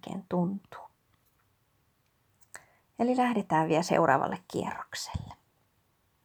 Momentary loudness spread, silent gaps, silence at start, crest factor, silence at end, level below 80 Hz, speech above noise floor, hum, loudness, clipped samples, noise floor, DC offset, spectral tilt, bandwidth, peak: 25 LU; none; 0.05 s; 22 dB; 0.9 s; -58 dBFS; 42 dB; none; -29 LUFS; under 0.1%; -71 dBFS; under 0.1%; -5.5 dB/octave; over 20 kHz; -10 dBFS